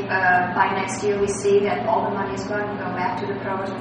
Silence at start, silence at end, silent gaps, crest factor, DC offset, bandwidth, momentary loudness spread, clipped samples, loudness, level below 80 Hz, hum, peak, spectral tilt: 0 s; 0 s; none; 16 dB; under 0.1%; 10 kHz; 8 LU; under 0.1%; -22 LUFS; -54 dBFS; none; -6 dBFS; -5 dB/octave